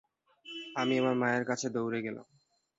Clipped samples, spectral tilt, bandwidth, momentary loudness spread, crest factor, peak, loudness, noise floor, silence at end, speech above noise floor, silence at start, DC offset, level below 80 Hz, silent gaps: under 0.1%; -4.5 dB/octave; 8 kHz; 15 LU; 18 dB; -16 dBFS; -32 LUFS; -53 dBFS; 0.55 s; 21 dB; 0.45 s; under 0.1%; -76 dBFS; none